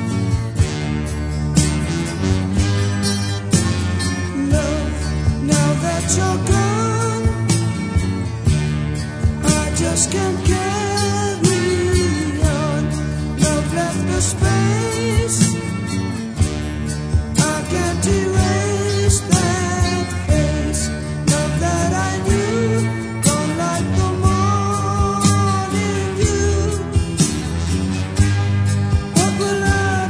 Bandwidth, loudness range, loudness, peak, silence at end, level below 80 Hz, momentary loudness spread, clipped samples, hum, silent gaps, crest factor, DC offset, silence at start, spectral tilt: 11 kHz; 1 LU; -18 LUFS; 0 dBFS; 0 s; -28 dBFS; 5 LU; under 0.1%; none; none; 18 dB; under 0.1%; 0 s; -5 dB/octave